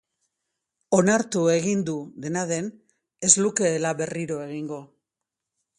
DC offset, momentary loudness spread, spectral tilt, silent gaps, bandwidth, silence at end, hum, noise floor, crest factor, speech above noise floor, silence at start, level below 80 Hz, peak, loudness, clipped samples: under 0.1%; 15 LU; -4 dB/octave; none; 11.5 kHz; 0.95 s; none; -86 dBFS; 24 dB; 62 dB; 0.9 s; -66 dBFS; -2 dBFS; -23 LUFS; under 0.1%